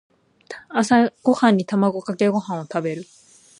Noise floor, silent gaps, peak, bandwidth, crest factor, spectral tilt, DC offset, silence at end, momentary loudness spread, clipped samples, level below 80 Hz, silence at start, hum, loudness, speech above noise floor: -41 dBFS; none; -4 dBFS; 11 kHz; 18 dB; -6 dB/octave; under 0.1%; 0.55 s; 13 LU; under 0.1%; -66 dBFS; 0.5 s; none; -20 LUFS; 22 dB